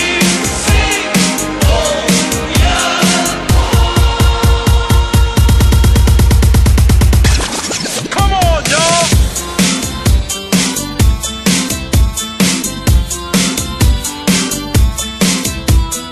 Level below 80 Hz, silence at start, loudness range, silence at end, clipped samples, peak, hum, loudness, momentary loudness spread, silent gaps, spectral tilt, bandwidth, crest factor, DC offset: -14 dBFS; 0 s; 3 LU; 0 s; under 0.1%; 0 dBFS; none; -12 LUFS; 5 LU; none; -4 dB/octave; 13.5 kHz; 10 dB; under 0.1%